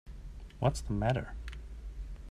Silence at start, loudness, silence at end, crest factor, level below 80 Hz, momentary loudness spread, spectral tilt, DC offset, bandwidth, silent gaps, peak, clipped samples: 0.05 s; -35 LUFS; 0 s; 22 dB; -42 dBFS; 17 LU; -6.5 dB/octave; under 0.1%; 12.5 kHz; none; -14 dBFS; under 0.1%